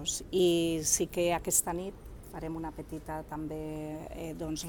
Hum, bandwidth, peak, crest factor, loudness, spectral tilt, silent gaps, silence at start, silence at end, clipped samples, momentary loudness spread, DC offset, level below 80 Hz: none; 19 kHz; -12 dBFS; 22 dB; -32 LUFS; -3.5 dB/octave; none; 0 s; 0 s; under 0.1%; 15 LU; under 0.1%; -50 dBFS